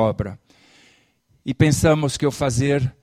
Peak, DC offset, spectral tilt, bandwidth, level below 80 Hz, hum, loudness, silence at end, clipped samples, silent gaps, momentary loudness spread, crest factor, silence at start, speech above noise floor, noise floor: -2 dBFS; under 0.1%; -6 dB/octave; 15 kHz; -42 dBFS; none; -20 LUFS; 0.1 s; under 0.1%; none; 14 LU; 20 dB; 0 s; 42 dB; -61 dBFS